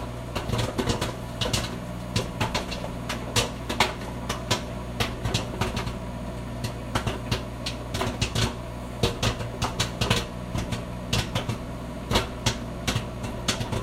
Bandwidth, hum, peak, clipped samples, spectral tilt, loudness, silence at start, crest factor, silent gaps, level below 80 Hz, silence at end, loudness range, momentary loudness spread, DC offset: 16 kHz; 60 Hz at -35 dBFS; -4 dBFS; under 0.1%; -4 dB/octave; -29 LUFS; 0 s; 24 dB; none; -38 dBFS; 0 s; 2 LU; 8 LU; under 0.1%